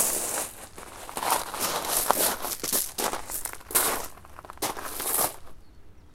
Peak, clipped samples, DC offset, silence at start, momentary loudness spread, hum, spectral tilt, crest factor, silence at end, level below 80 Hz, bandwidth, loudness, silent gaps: 0 dBFS; under 0.1%; under 0.1%; 0 s; 17 LU; none; -0.5 dB/octave; 30 dB; 0 s; -52 dBFS; 17 kHz; -27 LUFS; none